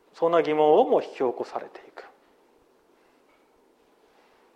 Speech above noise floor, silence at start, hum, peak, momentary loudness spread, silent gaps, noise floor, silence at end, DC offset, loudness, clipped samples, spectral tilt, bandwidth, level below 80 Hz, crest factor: 39 dB; 0.2 s; none; -6 dBFS; 24 LU; none; -62 dBFS; 2.55 s; under 0.1%; -23 LUFS; under 0.1%; -6.5 dB/octave; 7.6 kHz; -78 dBFS; 20 dB